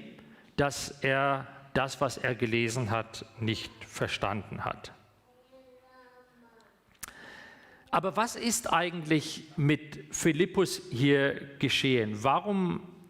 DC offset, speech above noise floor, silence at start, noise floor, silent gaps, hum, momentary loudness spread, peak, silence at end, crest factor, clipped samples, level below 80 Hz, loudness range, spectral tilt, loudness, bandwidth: under 0.1%; 33 dB; 0 s; -63 dBFS; none; none; 15 LU; -12 dBFS; 0.05 s; 20 dB; under 0.1%; -60 dBFS; 11 LU; -4.5 dB/octave; -30 LUFS; 16.5 kHz